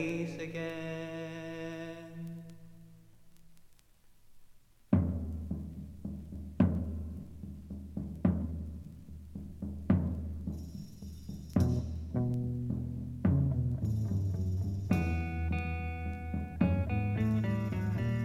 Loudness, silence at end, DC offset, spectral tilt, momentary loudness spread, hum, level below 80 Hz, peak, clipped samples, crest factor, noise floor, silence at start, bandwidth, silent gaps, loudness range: -35 LUFS; 0 s; under 0.1%; -8.5 dB/octave; 15 LU; none; -46 dBFS; -14 dBFS; under 0.1%; 22 dB; -60 dBFS; 0 s; 13.5 kHz; none; 9 LU